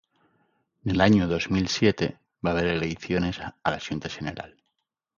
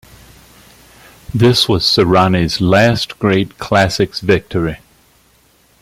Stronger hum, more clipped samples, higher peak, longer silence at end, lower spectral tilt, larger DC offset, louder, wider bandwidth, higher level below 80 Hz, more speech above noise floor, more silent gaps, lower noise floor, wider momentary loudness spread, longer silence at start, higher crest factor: neither; neither; second, -6 dBFS vs 0 dBFS; second, 0.7 s vs 1.05 s; about the same, -6 dB/octave vs -5.5 dB/octave; neither; second, -26 LUFS vs -13 LUFS; second, 7.4 kHz vs 16 kHz; second, -46 dBFS vs -40 dBFS; first, 56 dB vs 39 dB; neither; first, -80 dBFS vs -52 dBFS; first, 14 LU vs 9 LU; second, 0.85 s vs 1.35 s; first, 22 dB vs 14 dB